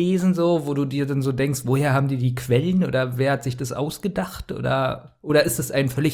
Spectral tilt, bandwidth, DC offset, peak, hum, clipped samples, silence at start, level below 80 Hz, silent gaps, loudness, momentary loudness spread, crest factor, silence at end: -6 dB/octave; 18.5 kHz; under 0.1%; -6 dBFS; none; under 0.1%; 0 s; -50 dBFS; none; -22 LUFS; 7 LU; 16 dB; 0 s